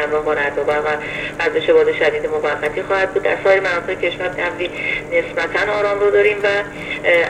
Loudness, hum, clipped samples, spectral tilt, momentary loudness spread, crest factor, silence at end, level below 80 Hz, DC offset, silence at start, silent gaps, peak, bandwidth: -17 LUFS; 50 Hz at -45 dBFS; under 0.1%; -4.5 dB/octave; 7 LU; 16 dB; 0 s; -46 dBFS; under 0.1%; 0 s; none; -2 dBFS; 11.5 kHz